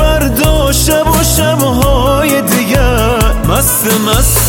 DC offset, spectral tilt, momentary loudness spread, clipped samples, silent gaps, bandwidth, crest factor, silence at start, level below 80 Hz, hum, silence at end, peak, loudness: under 0.1%; -4 dB/octave; 2 LU; under 0.1%; none; 17.5 kHz; 10 dB; 0 s; -16 dBFS; none; 0 s; 0 dBFS; -10 LUFS